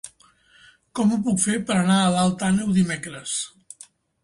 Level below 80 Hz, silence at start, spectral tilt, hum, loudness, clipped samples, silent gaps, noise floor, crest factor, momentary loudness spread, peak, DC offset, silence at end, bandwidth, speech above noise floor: -56 dBFS; 0.05 s; -4.5 dB/octave; none; -22 LUFS; under 0.1%; none; -56 dBFS; 16 dB; 22 LU; -8 dBFS; under 0.1%; 0.75 s; 11.5 kHz; 35 dB